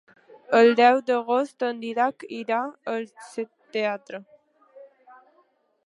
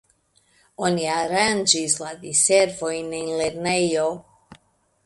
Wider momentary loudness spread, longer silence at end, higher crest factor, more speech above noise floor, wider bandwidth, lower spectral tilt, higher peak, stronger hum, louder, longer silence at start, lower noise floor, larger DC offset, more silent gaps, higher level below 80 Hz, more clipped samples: first, 17 LU vs 10 LU; first, 1 s vs 0.5 s; about the same, 20 dB vs 22 dB; about the same, 42 dB vs 41 dB; about the same, 11 kHz vs 11.5 kHz; first, -4.5 dB/octave vs -2.5 dB/octave; about the same, -4 dBFS vs -2 dBFS; neither; second, -24 LUFS vs -21 LUFS; second, 0.5 s vs 0.8 s; about the same, -65 dBFS vs -63 dBFS; neither; neither; second, -84 dBFS vs -60 dBFS; neither